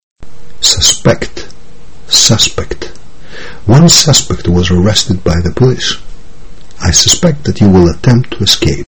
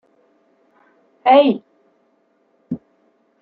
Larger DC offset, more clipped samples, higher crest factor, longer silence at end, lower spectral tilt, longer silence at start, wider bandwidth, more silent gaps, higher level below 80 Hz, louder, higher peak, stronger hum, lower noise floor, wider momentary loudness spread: first, 10% vs under 0.1%; first, 1% vs under 0.1%; second, 10 dB vs 20 dB; second, 0 s vs 0.65 s; second, -4 dB/octave vs -9 dB/octave; second, 0 s vs 1.25 s; first, over 20 kHz vs 4.7 kHz; first, 0.03-0.16 s vs none; first, -26 dBFS vs -66 dBFS; first, -8 LUFS vs -15 LUFS; about the same, 0 dBFS vs -2 dBFS; neither; second, -36 dBFS vs -62 dBFS; about the same, 17 LU vs 19 LU